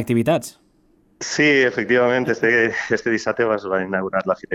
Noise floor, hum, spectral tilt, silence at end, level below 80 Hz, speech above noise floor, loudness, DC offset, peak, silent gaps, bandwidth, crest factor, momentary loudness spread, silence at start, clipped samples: -58 dBFS; none; -5 dB/octave; 0 s; -58 dBFS; 39 dB; -19 LUFS; under 0.1%; -6 dBFS; none; 16 kHz; 14 dB; 7 LU; 0 s; under 0.1%